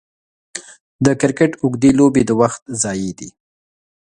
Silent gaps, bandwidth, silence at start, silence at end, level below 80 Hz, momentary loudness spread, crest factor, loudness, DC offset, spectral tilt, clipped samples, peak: 0.80-0.99 s, 2.62-2.66 s; 10.5 kHz; 0.55 s; 0.75 s; -48 dBFS; 19 LU; 18 dB; -16 LUFS; under 0.1%; -5.5 dB/octave; under 0.1%; 0 dBFS